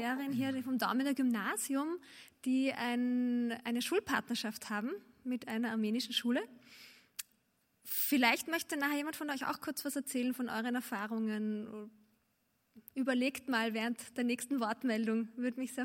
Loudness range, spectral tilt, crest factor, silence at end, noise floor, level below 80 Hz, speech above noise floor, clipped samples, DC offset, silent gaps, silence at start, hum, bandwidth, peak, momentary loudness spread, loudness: 4 LU; -3.5 dB/octave; 22 dB; 0 s; -78 dBFS; -80 dBFS; 42 dB; under 0.1%; under 0.1%; none; 0 s; none; 16.5 kHz; -14 dBFS; 13 LU; -35 LUFS